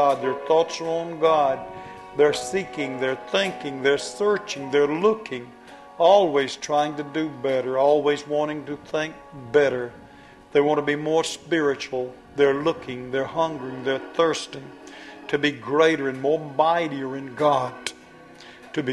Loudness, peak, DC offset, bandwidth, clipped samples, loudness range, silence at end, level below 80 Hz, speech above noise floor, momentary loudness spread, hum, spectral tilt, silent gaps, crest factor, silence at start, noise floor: -23 LUFS; -4 dBFS; under 0.1%; 12 kHz; under 0.1%; 3 LU; 0 s; -62 dBFS; 24 dB; 13 LU; none; -4.5 dB/octave; none; 18 dB; 0 s; -47 dBFS